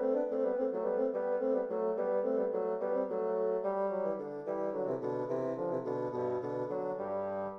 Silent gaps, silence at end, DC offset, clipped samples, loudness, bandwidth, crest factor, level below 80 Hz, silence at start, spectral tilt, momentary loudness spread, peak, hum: none; 0 s; under 0.1%; under 0.1%; -34 LUFS; 6.2 kHz; 12 dB; -76 dBFS; 0 s; -9.5 dB/octave; 4 LU; -20 dBFS; none